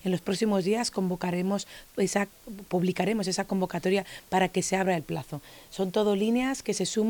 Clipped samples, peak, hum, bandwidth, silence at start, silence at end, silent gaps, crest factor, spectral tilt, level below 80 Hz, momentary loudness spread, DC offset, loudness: under 0.1%; -12 dBFS; none; 19 kHz; 0.05 s; 0 s; none; 16 dB; -5 dB/octave; -60 dBFS; 9 LU; under 0.1%; -28 LUFS